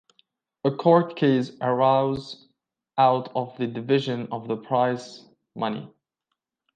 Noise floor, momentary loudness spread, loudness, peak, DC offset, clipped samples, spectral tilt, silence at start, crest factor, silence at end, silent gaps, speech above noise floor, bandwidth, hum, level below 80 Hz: -82 dBFS; 14 LU; -24 LUFS; -6 dBFS; under 0.1%; under 0.1%; -7.5 dB/octave; 0.65 s; 20 dB; 0.9 s; none; 59 dB; 9 kHz; none; -66 dBFS